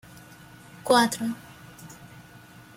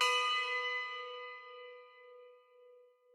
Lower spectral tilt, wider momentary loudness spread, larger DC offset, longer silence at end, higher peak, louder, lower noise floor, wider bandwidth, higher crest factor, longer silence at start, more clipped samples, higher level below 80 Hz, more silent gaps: first, -3.5 dB/octave vs 5 dB/octave; about the same, 27 LU vs 25 LU; neither; first, 0.55 s vs 0.35 s; first, -8 dBFS vs -20 dBFS; first, -23 LUFS vs -35 LUFS; second, -49 dBFS vs -63 dBFS; about the same, 16.5 kHz vs 16.5 kHz; about the same, 22 dB vs 20 dB; first, 0.15 s vs 0 s; neither; first, -64 dBFS vs under -90 dBFS; neither